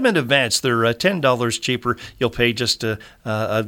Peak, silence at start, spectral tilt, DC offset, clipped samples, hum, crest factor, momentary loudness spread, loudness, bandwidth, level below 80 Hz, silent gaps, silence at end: -2 dBFS; 0 s; -4 dB/octave; under 0.1%; under 0.1%; none; 18 dB; 9 LU; -19 LUFS; 18.5 kHz; -48 dBFS; none; 0 s